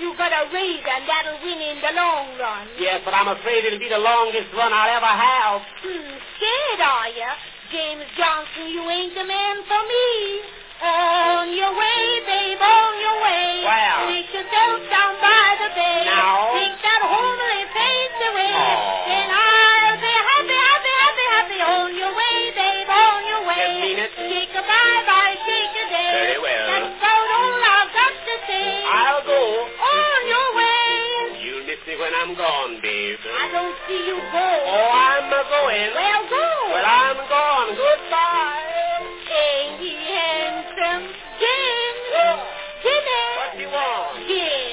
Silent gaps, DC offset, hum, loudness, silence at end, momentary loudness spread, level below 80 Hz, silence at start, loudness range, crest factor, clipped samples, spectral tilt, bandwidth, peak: none; under 0.1%; none; -18 LUFS; 0 s; 11 LU; -56 dBFS; 0 s; 6 LU; 18 dB; under 0.1%; -5 dB/octave; 4 kHz; -2 dBFS